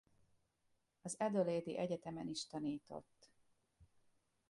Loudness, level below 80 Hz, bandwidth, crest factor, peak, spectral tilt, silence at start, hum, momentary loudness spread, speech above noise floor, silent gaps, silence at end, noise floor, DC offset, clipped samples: -42 LUFS; -78 dBFS; 11.5 kHz; 20 dB; -24 dBFS; -5 dB/octave; 1.05 s; none; 15 LU; 40 dB; none; 0.65 s; -82 dBFS; under 0.1%; under 0.1%